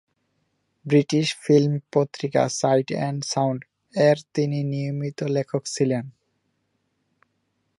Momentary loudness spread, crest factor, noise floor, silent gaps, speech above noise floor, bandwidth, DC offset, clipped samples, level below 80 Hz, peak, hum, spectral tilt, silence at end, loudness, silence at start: 9 LU; 18 dB; -73 dBFS; none; 51 dB; 11.5 kHz; under 0.1%; under 0.1%; -70 dBFS; -6 dBFS; 50 Hz at -50 dBFS; -6 dB/octave; 1.7 s; -23 LUFS; 0.85 s